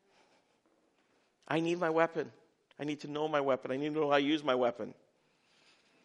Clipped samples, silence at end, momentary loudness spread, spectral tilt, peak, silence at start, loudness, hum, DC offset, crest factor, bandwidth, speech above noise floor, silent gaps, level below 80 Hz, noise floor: under 0.1%; 1.15 s; 12 LU; -6 dB/octave; -12 dBFS; 1.5 s; -33 LUFS; none; under 0.1%; 22 dB; 10 kHz; 41 dB; none; -84 dBFS; -73 dBFS